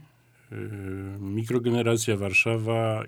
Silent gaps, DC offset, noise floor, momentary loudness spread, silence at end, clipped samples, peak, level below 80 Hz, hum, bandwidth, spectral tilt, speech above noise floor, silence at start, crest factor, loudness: none; under 0.1%; -57 dBFS; 15 LU; 0 s; under 0.1%; -10 dBFS; -66 dBFS; none; 18 kHz; -5.5 dB/octave; 31 dB; 0.5 s; 18 dB; -26 LUFS